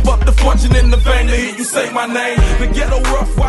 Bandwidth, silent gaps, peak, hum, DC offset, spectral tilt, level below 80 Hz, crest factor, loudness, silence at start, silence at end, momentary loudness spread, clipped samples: 12 kHz; none; -2 dBFS; none; under 0.1%; -5 dB/octave; -12 dBFS; 10 dB; -14 LUFS; 0 s; 0 s; 5 LU; under 0.1%